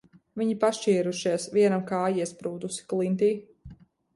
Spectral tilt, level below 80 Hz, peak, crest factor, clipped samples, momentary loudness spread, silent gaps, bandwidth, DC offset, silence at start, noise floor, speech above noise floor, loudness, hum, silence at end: -5.5 dB/octave; -64 dBFS; -12 dBFS; 16 dB; under 0.1%; 11 LU; none; 11.5 kHz; under 0.1%; 0.35 s; -49 dBFS; 23 dB; -27 LUFS; none; 0.4 s